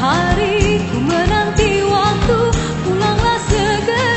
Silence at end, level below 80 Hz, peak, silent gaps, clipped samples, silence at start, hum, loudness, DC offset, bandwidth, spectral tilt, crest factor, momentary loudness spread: 0 s; -26 dBFS; 0 dBFS; none; under 0.1%; 0 s; none; -15 LUFS; under 0.1%; 8.4 kHz; -5 dB/octave; 14 dB; 2 LU